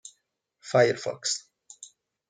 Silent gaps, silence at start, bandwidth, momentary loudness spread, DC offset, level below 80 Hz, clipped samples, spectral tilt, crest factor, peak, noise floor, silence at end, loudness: none; 0.05 s; 9.6 kHz; 24 LU; under 0.1%; -76 dBFS; under 0.1%; -3.5 dB/octave; 22 dB; -8 dBFS; -75 dBFS; 0.45 s; -26 LUFS